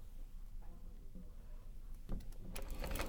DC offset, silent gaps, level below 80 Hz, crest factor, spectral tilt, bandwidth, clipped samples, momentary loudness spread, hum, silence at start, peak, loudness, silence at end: under 0.1%; none; -46 dBFS; 22 dB; -4.5 dB/octave; over 20 kHz; under 0.1%; 10 LU; none; 0 s; -24 dBFS; -53 LUFS; 0 s